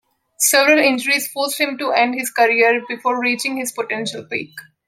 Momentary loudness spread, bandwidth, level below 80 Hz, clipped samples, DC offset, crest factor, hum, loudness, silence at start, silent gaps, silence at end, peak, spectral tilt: 11 LU; 16.5 kHz; -70 dBFS; under 0.1%; under 0.1%; 18 dB; none; -17 LUFS; 0.4 s; none; 0.25 s; 0 dBFS; -1.5 dB/octave